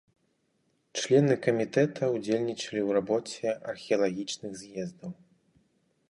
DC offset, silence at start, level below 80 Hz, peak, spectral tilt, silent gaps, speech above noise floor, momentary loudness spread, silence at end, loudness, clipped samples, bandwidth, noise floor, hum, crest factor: under 0.1%; 0.95 s; -72 dBFS; -10 dBFS; -5.5 dB/octave; none; 45 dB; 14 LU; 1 s; -29 LUFS; under 0.1%; 11.5 kHz; -73 dBFS; none; 20 dB